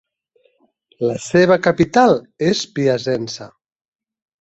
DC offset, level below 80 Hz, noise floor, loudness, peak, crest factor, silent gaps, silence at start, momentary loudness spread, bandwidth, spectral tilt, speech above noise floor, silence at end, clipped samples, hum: under 0.1%; -54 dBFS; -61 dBFS; -16 LUFS; -2 dBFS; 18 dB; none; 1 s; 10 LU; 8.2 kHz; -5.5 dB/octave; 45 dB; 0.95 s; under 0.1%; none